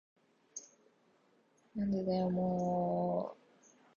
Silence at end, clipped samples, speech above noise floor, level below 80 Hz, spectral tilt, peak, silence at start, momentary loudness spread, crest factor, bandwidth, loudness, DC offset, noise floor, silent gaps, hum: 0.65 s; under 0.1%; 37 dB; -68 dBFS; -7.5 dB/octave; -22 dBFS; 0.55 s; 16 LU; 16 dB; 7.2 kHz; -35 LUFS; under 0.1%; -71 dBFS; none; none